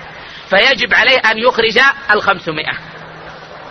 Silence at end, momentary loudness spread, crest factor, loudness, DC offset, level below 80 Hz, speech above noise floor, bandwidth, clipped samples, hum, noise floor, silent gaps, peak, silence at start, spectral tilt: 0 s; 22 LU; 14 dB; -11 LUFS; under 0.1%; -46 dBFS; 20 dB; 11 kHz; under 0.1%; none; -32 dBFS; none; 0 dBFS; 0 s; -3 dB/octave